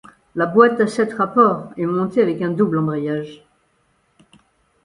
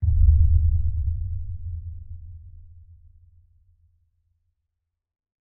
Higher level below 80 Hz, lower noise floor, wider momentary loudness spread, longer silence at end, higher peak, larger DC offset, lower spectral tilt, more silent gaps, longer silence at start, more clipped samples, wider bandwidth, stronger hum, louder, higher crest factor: second, -60 dBFS vs -26 dBFS; second, -63 dBFS vs -82 dBFS; second, 11 LU vs 23 LU; second, 1.5 s vs 2.9 s; first, 0 dBFS vs -6 dBFS; neither; second, -7.5 dB/octave vs -18 dB/octave; neither; first, 0.35 s vs 0 s; neither; first, 11 kHz vs 0.7 kHz; neither; first, -18 LUFS vs -24 LUFS; about the same, 20 dB vs 18 dB